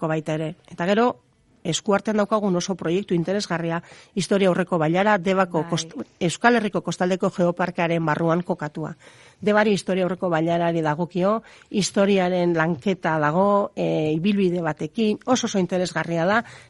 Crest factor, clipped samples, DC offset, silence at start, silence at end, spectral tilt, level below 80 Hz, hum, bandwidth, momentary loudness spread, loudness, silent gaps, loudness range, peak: 20 dB; under 0.1%; under 0.1%; 0 s; 0.1 s; -5.5 dB/octave; -62 dBFS; none; 11.5 kHz; 8 LU; -22 LUFS; none; 2 LU; -2 dBFS